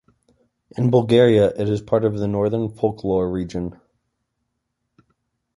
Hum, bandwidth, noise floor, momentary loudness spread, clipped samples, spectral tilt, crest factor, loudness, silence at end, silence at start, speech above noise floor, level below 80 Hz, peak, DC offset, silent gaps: none; 11.5 kHz; -76 dBFS; 13 LU; under 0.1%; -8 dB/octave; 18 dB; -19 LUFS; 1.85 s; 0.75 s; 57 dB; -48 dBFS; -2 dBFS; under 0.1%; none